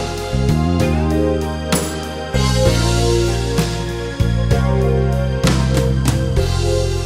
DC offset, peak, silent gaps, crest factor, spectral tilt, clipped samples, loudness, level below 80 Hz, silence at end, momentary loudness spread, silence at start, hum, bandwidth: under 0.1%; 0 dBFS; none; 16 dB; -5.5 dB/octave; under 0.1%; -17 LUFS; -22 dBFS; 0 s; 6 LU; 0 s; none; 16 kHz